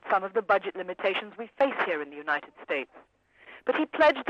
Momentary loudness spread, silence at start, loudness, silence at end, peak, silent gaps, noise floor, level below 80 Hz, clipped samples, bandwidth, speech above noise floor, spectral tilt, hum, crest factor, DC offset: 9 LU; 0.05 s; -28 LUFS; 0 s; -12 dBFS; none; -53 dBFS; -70 dBFS; under 0.1%; 8 kHz; 25 dB; -5 dB/octave; none; 16 dB; under 0.1%